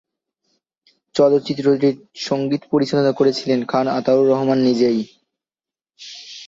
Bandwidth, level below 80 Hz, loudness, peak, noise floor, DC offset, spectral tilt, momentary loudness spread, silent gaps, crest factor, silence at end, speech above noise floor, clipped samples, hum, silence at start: 7.8 kHz; -64 dBFS; -18 LUFS; -4 dBFS; under -90 dBFS; under 0.1%; -6.5 dB/octave; 11 LU; none; 16 dB; 0 s; over 73 dB; under 0.1%; none; 1.15 s